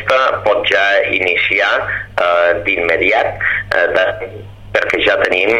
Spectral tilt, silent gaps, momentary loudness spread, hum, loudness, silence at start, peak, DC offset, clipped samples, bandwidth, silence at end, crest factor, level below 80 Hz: -4 dB/octave; none; 6 LU; none; -13 LUFS; 0 s; 0 dBFS; 0.3%; under 0.1%; 11.5 kHz; 0 s; 14 dB; -42 dBFS